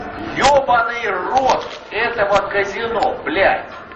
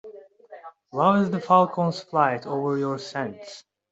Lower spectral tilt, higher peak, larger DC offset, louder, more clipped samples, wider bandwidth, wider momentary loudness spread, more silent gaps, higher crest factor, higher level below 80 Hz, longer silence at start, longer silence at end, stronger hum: second, -3.5 dB/octave vs -7 dB/octave; about the same, -2 dBFS vs -4 dBFS; neither; first, -17 LUFS vs -23 LUFS; neither; about the same, 8.6 kHz vs 8 kHz; second, 7 LU vs 14 LU; neither; about the same, 16 dB vs 20 dB; first, -44 dBFS vs -68 dBFS; about the same, 0 s vs 0.05 s; second, 0 s vs 0.3 s; neither